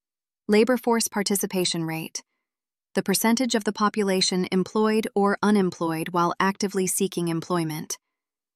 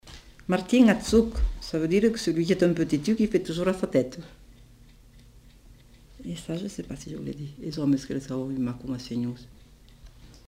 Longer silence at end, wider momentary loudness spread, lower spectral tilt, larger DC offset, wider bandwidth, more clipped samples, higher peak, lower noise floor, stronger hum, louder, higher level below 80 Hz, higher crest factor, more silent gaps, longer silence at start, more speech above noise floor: first, 0.6 s vs 0.15 s; second, 9 LU vs 16 LU; second, -4 dB/octave vs -6 dB/octave; neither; about the same, 15.5 kHz vs 16 kHz; neither; about the same, -8 dBFS vs -8 dBFS; first, under -90 dBFS vs -52 dBFS; neither; about the same, -24 LUFS vs -26 LUFS; second, -68 dBFS vs -40 dBFS; about the same, 18 dB vs 20 dB; neither; first, 0.5 s vs 0.05 s; first, over 67 dB vs 27 dB